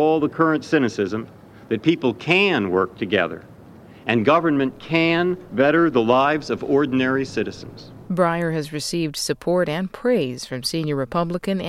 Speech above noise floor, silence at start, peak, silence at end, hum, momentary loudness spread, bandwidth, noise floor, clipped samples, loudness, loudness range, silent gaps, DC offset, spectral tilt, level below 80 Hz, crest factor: 23 dB; 0 s; -2 dBFS; 0 s; none; 10 LU; 15 kHz; -44 dBFS; under 0.1%; -21 LUFS; 4 LU; none; under 0.1%; -5.5 dB/octave; -54 dBFS; 18 dB